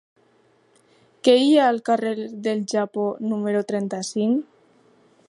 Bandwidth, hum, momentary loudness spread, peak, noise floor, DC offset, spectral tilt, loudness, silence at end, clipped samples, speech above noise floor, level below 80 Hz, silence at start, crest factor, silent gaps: 11.5 kHz; none; 10 LU; -4 dBFS; -60 dBFS; under 0.1%; -5 dB/octave; -22 LUFS; 0.85 s; under 0.1%; 39 dB; -78 dBFS; 1.25 s; 18 dB; none